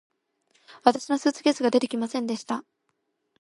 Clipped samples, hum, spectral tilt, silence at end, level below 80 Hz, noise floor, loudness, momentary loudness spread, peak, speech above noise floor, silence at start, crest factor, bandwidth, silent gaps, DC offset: under 0.1%; none; -4 dB/octave; 0.8 s; -76 dBFS; -76 dBFS; -25 LUFS; 8 LU; -2 dBFS; 52 dB; 0.7 s; 24 dB; 11.5 kHz; none; under 0.1%